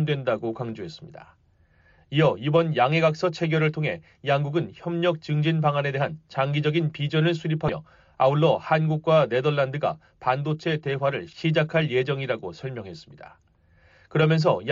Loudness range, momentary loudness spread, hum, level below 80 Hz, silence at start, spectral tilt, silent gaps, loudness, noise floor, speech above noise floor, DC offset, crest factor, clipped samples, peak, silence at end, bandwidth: 3 LU; 11 LU; none; -62 dBFS; 0 s; -5.5 dB/octave; none; -24 LUFS; -60 dBFS; 36 dB; under 0.1%; 16 dB; under 0.1%; -8 dBFS; 0 s; 7.2 kHz